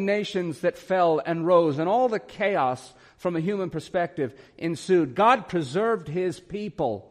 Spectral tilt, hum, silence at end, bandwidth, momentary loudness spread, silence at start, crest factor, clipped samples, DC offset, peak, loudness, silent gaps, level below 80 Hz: -6.5 dB/octave; none; 0.1 s; 12 kHz; 11 LU; 0 s; 18 dB; under 0.1%; under 0.1%; -8 dBFS; -25 LUFS; none; -62 dBFS